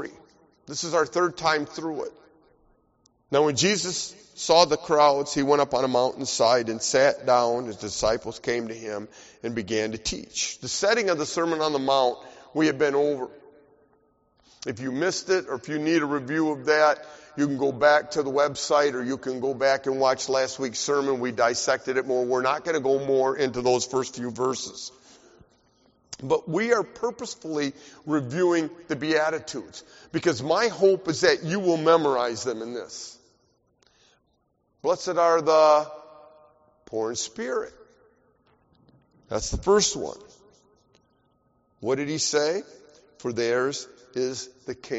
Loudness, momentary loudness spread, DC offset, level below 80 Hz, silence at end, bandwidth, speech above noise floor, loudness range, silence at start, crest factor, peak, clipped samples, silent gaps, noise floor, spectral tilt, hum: -24 LUFS; 15 LU; under 0.1%; -54 dBFS; 0 s; 8 kHz; 46 dB; 6 LU; 0 s; 22 dB; -4 dBFS; under 0.1%; none; -70 dBFS; -3 dB/octave; none